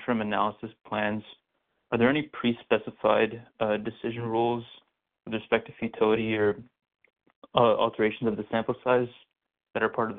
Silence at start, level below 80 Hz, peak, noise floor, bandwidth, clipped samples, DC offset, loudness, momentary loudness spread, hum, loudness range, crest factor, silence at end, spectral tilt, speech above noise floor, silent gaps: 0 s; -62 dBFS; -6 dBFS; -76 dBFS; 4.2 kHz; under 0.1%; under 0.1%; -28 LUFS; 12 LU; none; 2 LU; 22 dB; 0 s; -4 dB/octave; 49 dB; 7.35-7.42 s